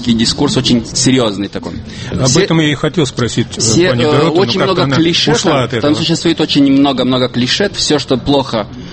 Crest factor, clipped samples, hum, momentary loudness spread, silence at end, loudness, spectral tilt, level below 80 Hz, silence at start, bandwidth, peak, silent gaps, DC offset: 12 dB; under 0.1%; none; 6 LU; 0 s; -12 LUFS; -4.5 dB/octave; -36 dBFS; 0 s; 8.8 kHz; 0 dBFS; none; under 0.1%